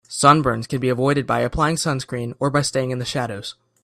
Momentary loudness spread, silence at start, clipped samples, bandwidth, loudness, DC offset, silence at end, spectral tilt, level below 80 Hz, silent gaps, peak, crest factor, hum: 12 LU; 0.1 s; under 0.1%; 14.5 kHz; -20 LUFS; under 0.1%; 0.3 s; -5 dB/octave; -44 dBFS; none; 0 dBFS; 20 dB; none